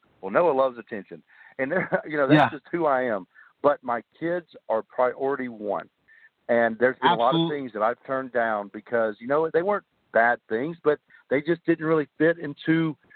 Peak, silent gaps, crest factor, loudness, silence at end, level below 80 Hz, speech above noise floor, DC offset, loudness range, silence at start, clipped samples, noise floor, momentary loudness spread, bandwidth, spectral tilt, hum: -4 dBFS; none; 20 dB; -25 LUFS; 0.2 s; -72 dBFS; 33 dB; under 0.1%; 3 LU; 0.25 s; under 0.1%; -57 dBFS; 10 LU; 4.6 kHz; -8.5 dB/octave; none